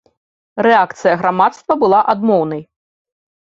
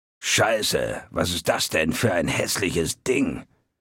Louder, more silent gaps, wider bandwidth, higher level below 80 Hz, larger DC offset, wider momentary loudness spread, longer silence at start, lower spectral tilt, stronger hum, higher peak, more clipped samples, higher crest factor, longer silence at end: first, -14 LUFS vs -23 LUFS; neither; second, 7.8 kHz vs 17 kHz; second, -60 dBFS vs -48 dBFS; neither; first, 9 LU vs 6 LU; first, 0.55 s vs 0.2 s; first, -6.5 dB/octave vs -3.5 dB/octave; neither; first, -2 dBFS vs -6 dBFS; neither; about the same, 14 dB vs 18 dB; first, 0.85 s vs 0.35 s